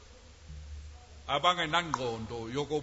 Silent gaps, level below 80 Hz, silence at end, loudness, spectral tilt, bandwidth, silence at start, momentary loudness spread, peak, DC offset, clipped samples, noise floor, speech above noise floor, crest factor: none; -52 dBFS; 0 s; -31 LUFS; -4 dB/octave; 8 kHz; 0 s; 22 LU; -10 dBFS; under 0.1%; under 0.1%; -53 dBFS; 21 dB; 22 dB